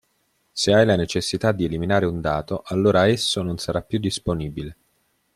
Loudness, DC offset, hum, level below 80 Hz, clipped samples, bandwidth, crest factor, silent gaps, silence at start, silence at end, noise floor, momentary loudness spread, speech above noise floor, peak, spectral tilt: -21 LUFS; under 0.1%; none; -46 dBFS; under 0.1%; 14.5 kHz; 18 dB; none; 0.55 s; 0.6 s; -68 dBFS; 10 LU; 47 dB; -4 dBFS; -5 dB/octave